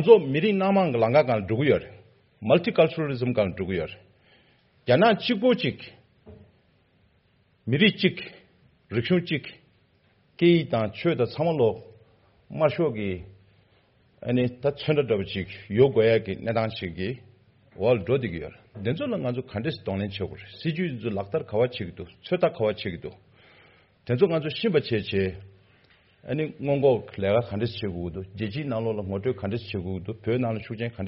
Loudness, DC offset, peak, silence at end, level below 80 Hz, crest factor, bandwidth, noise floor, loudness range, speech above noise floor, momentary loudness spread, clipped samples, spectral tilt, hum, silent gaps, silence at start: -25 LUFS; under 0.1%; -2 dBFS; 0 s; -58 dBFS; 22 dB; 5.8 kHz; -64 dBFS; 5 LU; 40 dB; 14 LU; under 0.1%; -5 dB/octave; none; none; 0 s